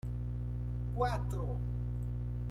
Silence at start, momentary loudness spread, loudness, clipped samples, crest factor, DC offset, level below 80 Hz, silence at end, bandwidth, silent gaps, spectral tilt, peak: 0.05 s; 5 LU; -37 LUFS; under 0.1%; 16 dB; under 0.1%; -40 dBFS; 0 s; 11.5 kHz; none; -8 dB/octave; -20 dBFS